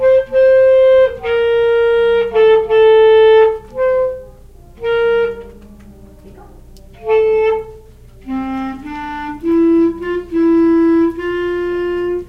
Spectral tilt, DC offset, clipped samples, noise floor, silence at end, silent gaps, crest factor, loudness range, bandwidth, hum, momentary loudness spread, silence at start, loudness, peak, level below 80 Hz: -6.5 dB/octave; under 0.1%; under 0.1%; -39 dBFS; 0 s; none; 12 dB; 9 LU; 5.6 kHz; none; 15 LU; 0 s; -13 LUFS; -2 dBFS; -40 dBFS